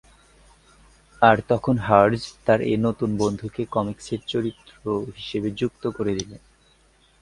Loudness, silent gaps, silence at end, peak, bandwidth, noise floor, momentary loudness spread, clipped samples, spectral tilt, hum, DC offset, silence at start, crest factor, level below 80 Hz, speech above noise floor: -23 LUFS; none; 0.85 s; 0 dBFS; 11.5 kHz; -59 dBFS; 12 LU; under 0.1%; -6 dB/octave; none; under 0.1%; 1.2 s; 24 dB; -52 dBFS; 36 dB